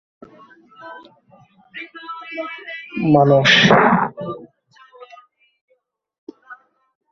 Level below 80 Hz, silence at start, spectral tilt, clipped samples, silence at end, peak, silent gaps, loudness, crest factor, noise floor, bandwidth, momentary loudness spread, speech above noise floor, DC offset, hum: -56 dBFS; 0.85 s; -5 dB/octave; under 0.1%; 0.6 s; 0 dBFS; 5.61-5.68 s, 6.18-6.27 s; -15 LUFS; 20 dB; -66 dBFS; 7.6 kHz; 27 LU; 52 dB; under 0.1%; none